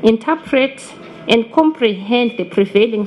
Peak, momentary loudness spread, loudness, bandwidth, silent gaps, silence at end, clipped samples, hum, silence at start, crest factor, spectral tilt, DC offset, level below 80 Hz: 0 dBFS; 9 LU; -15 LUFS; 11 kHz; none; 0 s; under 0.1%; none; 0 s; 16 dB; -5.5 dB/octave; under 0.1%; -54 dBFS